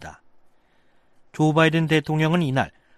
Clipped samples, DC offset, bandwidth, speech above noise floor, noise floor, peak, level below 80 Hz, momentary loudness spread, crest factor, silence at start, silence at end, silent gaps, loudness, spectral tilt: under 0.1%; under 0.1%; 12.5 kHz; 38 dB; -58 dBFS; -4 dBFS; -56 dBFS; 14 LU; 18 dB; 0 s; 0.3 s; none; -21 LUFS; -6.5 dB/octave